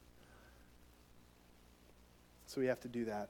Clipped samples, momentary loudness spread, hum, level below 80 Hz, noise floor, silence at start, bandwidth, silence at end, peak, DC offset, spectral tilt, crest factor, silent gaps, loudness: under 0.1%; 27 LU; 60 Hz at -70 dBFS; -68 dBFS; -65 dBFS; 0 s; 19 kHz; 0 s; -24 dBFS; under 0.1%; -5.5 dB/octave; 22 dB; none; -41 LUFS